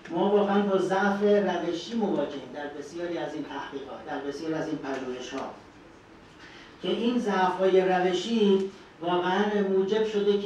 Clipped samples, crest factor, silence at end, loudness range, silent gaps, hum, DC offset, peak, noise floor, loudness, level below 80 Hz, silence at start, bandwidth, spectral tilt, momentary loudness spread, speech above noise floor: under 0.1%; 16 dB; 0 s; 10 LU; none; none; under 0.1%; -10 dBFS; -51 dBFS; -27 LUFS; -64 dBFS; 0 s; 9.4 kHz; -6 dB/octave; 14 LU; 24 dB